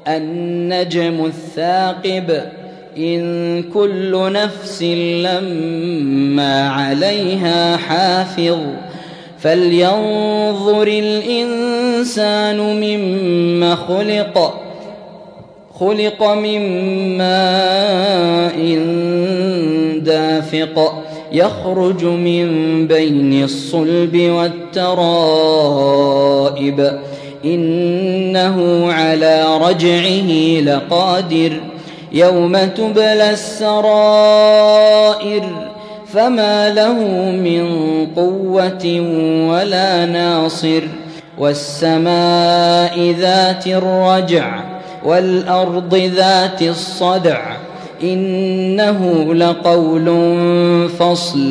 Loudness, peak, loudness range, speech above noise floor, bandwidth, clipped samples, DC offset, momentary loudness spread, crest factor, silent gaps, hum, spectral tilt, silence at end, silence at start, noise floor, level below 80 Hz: -14 LUFS; 0 dBFS; 5 LU; 25 dB; 10.5 kHz; under 0.1%; under 0.1%; 8 LU; 14 dB; none; none; -6 dB/octave; 0 s; 0.05 s; -38 dBFS; -60 dBFS